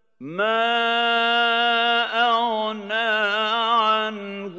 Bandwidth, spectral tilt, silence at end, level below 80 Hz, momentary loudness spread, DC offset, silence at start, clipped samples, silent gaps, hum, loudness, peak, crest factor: 8 kHz; -3.5 dB/octave; 0 s; -84 dBFS; 7 LU; under 0.1%; 0.2 s; under 0.1%; none; none; -20 LUFS; -8 dBFS; 14 dB